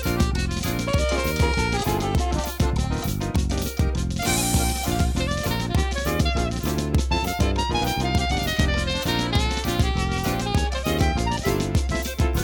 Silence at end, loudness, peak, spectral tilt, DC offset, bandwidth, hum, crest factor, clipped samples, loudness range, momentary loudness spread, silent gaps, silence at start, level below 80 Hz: 0 s; -23 LUFS; -6 dBFS; -5 dB/octave; under 0.1%; 19.5 kHz; none; 16 dB; under 0.1%; 1 LU; 3 LU; none; 0 s; -28 dBFS